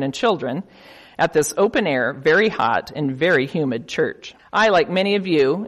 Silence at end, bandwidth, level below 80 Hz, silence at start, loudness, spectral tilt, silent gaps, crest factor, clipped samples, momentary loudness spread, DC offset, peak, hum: 0 s; 13 kHz; -56 dBFS; 0 s; -19 LUFS; -4.5 dB/octave; none; 14 dB; under 0.1%; 8 LU; under 0.1%; -6 dBFS; none